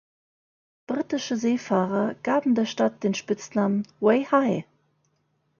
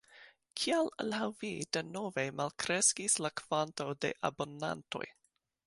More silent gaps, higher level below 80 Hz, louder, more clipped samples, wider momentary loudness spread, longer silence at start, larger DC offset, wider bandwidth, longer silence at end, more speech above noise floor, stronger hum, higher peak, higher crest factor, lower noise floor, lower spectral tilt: neither; about the same, -70 dBFS vs -74 dBFS; first, -25 LUFS vs -34 LUFS; neither; second, 6 LU vs 12 LU; first, 0.9 s vs 0.15 s; neither; second, 7.2 kHz vs 11.5 kHz; first, 0.95 s vs 0.55 s; first, 47 dB vs 25 dB; neither; first, -6 dBFS vs -14 dBFS; about the same, 18 dB vs 22 dB; first, -71 dBFS vs -60 dBFS; first, -6 dB/octave vs -2.5 dB/octave